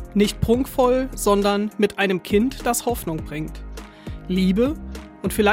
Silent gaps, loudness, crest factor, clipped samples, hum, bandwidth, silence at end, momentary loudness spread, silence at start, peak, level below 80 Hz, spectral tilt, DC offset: none; -21 LUFS; 16 dB; under 0.1%; none; 16.5 kHz; 0 s; 17 LU; 0 s; -6 dBFS; -36 dBFS; -5 dB/octave; under 0.1%